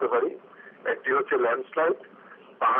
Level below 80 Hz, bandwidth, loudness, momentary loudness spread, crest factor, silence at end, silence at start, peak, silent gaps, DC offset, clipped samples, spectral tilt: -88 dBFS; 3.7 kHz; -27 LUFS; 10 LU; 14 dB; 0 s; 0 s; -12 dBFS; none; under 0.1%; under 0.1%; -2 dB/octave